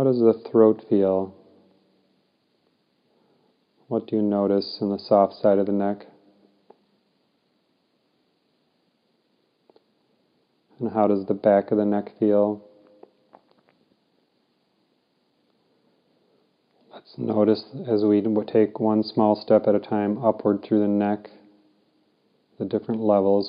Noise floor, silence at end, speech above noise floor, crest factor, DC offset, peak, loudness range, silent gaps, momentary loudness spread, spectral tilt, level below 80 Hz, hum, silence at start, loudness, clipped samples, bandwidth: -69 dBFS; 0 s; 48 dB; 20 dB; under 0.1%; -4 dBFS; 9 LU; none; 9 LU; -11.5 dB/octave; -78 dBFS; none; 0 s; -22 LUFS; under 0.1%; 5.2 kHz